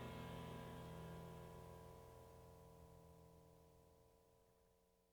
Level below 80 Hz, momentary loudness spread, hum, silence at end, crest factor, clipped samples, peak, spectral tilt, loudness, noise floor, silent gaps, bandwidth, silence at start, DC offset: -70 dBFS; 14 LU; 60 Hz at -75 dBFS; 0 s; 18 dB; under 0.1%; -42 dBFS; -6 dB/octave; -58 LUFS; -78 dBFS; none; over 20 kHz; 0 s; under 0.1%